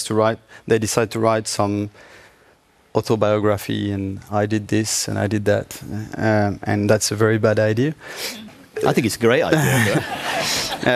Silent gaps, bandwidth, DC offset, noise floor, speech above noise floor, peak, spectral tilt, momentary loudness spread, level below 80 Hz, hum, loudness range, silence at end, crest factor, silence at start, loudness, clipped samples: none; 14.5 kHz; under 0.1%; -55 dBFS; 36 dB; -2 dBFS; -4.5 dB/octave; 11 LU; -54 dBFS; none; 3 LU; 0 s; 18 dB; 0 s; -20 LUFS; under 0.1%